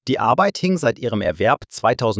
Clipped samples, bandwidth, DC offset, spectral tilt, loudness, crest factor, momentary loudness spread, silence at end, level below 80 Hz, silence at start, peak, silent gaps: under 0.1%; 8 kHz; under 0.1%; -5.5 dB/octave; -19 LUFS; 16 dB; 4 LU; 0 s; -46 dBFS; 0.05 s; -2 dBFS; none